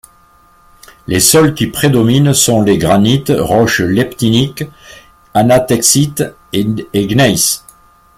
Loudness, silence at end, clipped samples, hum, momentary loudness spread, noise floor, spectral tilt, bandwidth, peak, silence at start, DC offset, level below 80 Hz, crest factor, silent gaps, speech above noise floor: -11 LUFS; 0.6 s; under 0.1%; none; 9 LU; -47 dBFS; -4.5 dB/octave; 16.5 kHz; 0 dBFS; 1.1 s; under 0.1%; -40 dBFS; 12 dB; none; 36 dB